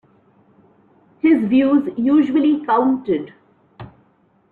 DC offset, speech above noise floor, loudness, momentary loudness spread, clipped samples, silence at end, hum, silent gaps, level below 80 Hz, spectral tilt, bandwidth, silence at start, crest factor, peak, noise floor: under 0.1%; 42 dB; -17 LUFS; 8 LU; under 0.1%; 0.65 s; none; none; -60 dBFS; -8.5 dB/octave; 4.3 kHz; 1.25 s; 14 dB; -4 dBFS; -58 dBFS